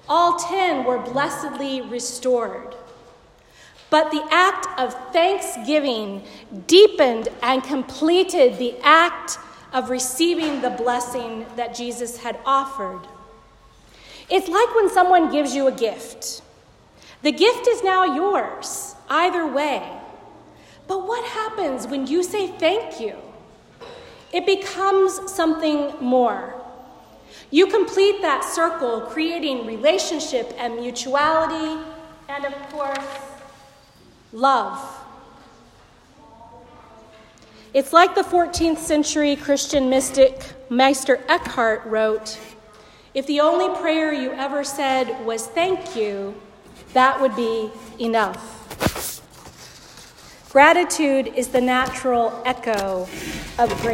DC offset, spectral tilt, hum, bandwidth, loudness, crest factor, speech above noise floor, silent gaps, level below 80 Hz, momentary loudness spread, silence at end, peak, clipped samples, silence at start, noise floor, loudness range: under 0.1%; -3 dB/octave; none; 16 kHz; -20 LUFS; 20 dB; 31 dB; none; -52 dBFS; 14 LU; 0 s; 0 dBFS; under 0.1%; 0.1 s; -51 dBFS; 7 LU